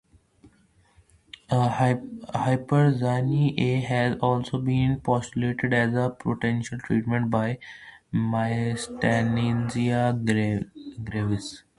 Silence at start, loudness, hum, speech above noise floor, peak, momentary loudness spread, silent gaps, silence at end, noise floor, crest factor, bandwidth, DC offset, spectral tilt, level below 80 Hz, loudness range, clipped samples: 0.45 s; -25 LUFS; none; 37 dB; -6 dBFS; 8 LU; none; 0.2 s; -61 dBFS; 18 dB; 11.5 kHz; under 0.1%; -7 dB/octave; -52 dBFS; 2 LU; under 0.1%